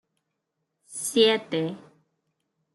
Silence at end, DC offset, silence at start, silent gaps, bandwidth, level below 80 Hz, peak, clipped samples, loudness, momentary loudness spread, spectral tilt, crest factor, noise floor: 0.95 s; under 0.1%; 0.9 s; none; 12.5 kHz; -78 dBFS; -8 dBFS; under 0.1%; -24 LUFS; 18 LU; -3 dB/octave; 22 dB; -80 dBFS